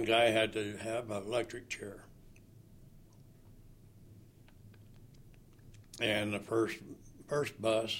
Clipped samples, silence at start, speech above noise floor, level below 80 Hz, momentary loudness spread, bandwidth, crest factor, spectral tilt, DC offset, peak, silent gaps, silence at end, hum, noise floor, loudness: under 0.1%; 0 s; 24 dB; -62 dBFS; 20 LU; 16.5 kHz; 22 dB; -4.5 dB/octave; under 0.1%; -16 dBFS; none; 0 s; none; -58 dBFS; -34 LUFS